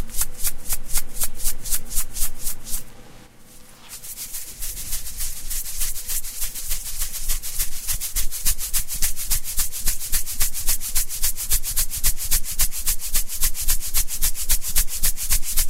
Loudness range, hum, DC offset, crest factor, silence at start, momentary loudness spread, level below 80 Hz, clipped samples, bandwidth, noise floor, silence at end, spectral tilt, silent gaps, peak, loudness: 8 LU; none; under 0.1%; 16 dB; 0 s; 8 LU; -26 dBFS; under 0.1%; 16 kHz; -43 dBFS; 0 s; 0 dB/octave; none; -2 dBFS; -24 LUFS